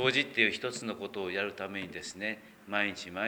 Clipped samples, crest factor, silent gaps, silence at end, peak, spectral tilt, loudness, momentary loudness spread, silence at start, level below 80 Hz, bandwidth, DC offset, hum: under 0.1%; 22 dB; none; 0 s; -10 dBFS; -3.5 dB/octave; -33 LUFS; 11 LU; 0 s; -72 dBFS; over 20 kHz; under 0.1%; none